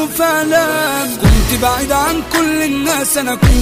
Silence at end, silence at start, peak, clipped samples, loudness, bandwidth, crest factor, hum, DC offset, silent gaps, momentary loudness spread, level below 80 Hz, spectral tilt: 0 s; 0 s; -2 dBFS; under 0.1%; -13 LUFS; 16 kHz; 12 dB; none; under 0.1%; none; 3 LU; -20 dBFS; -4 dB/octave